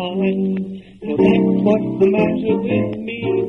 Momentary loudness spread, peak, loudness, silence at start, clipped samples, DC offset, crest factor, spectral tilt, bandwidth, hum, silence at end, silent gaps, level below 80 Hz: 10 LU; -4 dBFS; -18 LUFS; 0 s; under 0.1%; under 0.1%; 14 dB; -9 dB/octave; 5.4 kHz; none; 0 s; none; -50 dBFS